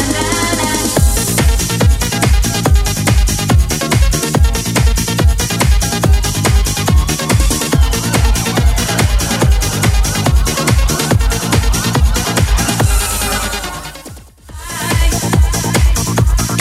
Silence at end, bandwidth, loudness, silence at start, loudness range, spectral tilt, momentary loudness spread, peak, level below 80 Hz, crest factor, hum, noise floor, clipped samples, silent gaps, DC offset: 0 s; 16.5 kHz; -13 LUFS; 0 s; 3 LU; -4 dB/octave; 2 LU; 0 dBFS; -16 dBFS; 12 dB; none; -33 dBFS; under 0.1%; none; under 0.1%